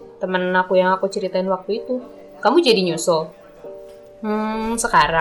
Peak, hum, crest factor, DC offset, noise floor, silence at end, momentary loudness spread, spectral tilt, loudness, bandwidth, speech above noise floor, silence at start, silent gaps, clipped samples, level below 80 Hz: -4 dBFS; none; 16 dB; under 0.1%; -39 dBFS; 0 s; 22 LU; -4 dB/octave; -19 LUFS; 19 kHz; 21 dB; 0 s; none; under 0.1%; -48 dBFS